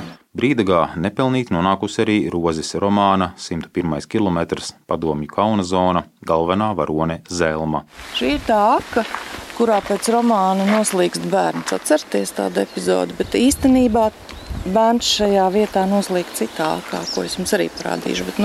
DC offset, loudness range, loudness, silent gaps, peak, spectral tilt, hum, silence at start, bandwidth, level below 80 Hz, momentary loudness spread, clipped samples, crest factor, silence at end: under 0.1%; 3 LU; -19 LUFS; none; -4 dBFS; -5 dB/octave; none; 0 s; 15 kHz; -42 dBFS; 8 LU; under 0.1%; 16 dB; 0 s